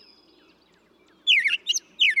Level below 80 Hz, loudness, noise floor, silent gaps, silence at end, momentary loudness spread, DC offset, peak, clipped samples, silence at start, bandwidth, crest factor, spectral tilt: -80 dBFS; -21 LUFS; -60 dBFS; none; 0 s; 8 LU; under 0.1%; -10 dBFS; under 0.1%; 1.25 s; 13 kHz; 16 dB; 4.5 dB/octave